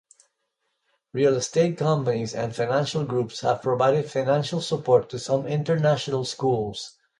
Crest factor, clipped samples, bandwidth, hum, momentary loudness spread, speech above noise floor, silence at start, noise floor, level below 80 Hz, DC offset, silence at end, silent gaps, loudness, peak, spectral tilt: 18 dB; under 0.1%; 11 kHz; none; 6 LU; 53 dB; 1.15 s; -76 dBFS; -62 dBFS; under 0.1%; 0.3 s; none; -24 LUFS; -6 dBFS; -5.5 dB/octave